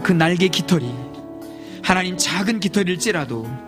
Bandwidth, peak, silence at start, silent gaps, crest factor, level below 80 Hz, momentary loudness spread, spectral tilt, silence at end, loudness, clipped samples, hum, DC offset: 15.5 kHz; 0 dBFS; 0 s; none; 20 dB; -50 dBFS; 18 LU; -4.5 dB/octave; 0 s; -19 LUFS; under 0.1%; none; under 0.1%